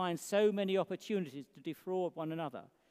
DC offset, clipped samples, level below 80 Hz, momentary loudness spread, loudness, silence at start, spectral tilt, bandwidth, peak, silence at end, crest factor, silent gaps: under 0.1%; under 0.1%; -90 dBFS; 14 LU; -36 LUFS; 0 s; -5.5 dB/octave; 15.5 kHz; -18 dBFS; 0.25 s; 18 dB; none